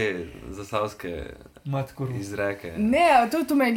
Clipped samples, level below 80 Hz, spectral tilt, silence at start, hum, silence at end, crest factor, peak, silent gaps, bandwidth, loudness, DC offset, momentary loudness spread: under 0.1%; -50 dBFS; -6 dB/octave; 0 s; none; 0 s; 18 dB; -6 dBFS; none; 17 kHz; -25 LUFS; under 0.1%; 19 LU